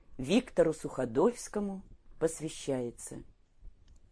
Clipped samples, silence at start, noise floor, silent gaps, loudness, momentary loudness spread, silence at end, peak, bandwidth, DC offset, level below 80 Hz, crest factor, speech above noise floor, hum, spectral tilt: under 0.1%; 0.1 s; -54 dBFS; none; -33 LUFS; 15 LU; 0.4 s; -14 dBFS; 11 kHz; under 0.1%; -54 dBFS; 20 dB; 22 dB; none; -5.5 dB/octave